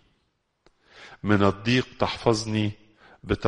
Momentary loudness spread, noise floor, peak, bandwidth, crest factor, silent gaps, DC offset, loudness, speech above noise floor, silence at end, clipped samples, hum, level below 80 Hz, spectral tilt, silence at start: 9 LU; -73 dBFS; -4 dBFS; 10.5 kHz; 22 dB; none; under 0.1%; -25 LUFS; 49 dB; 0 s; under 0.1%; none; -48 dBFS; -6 dB/octave; 1 s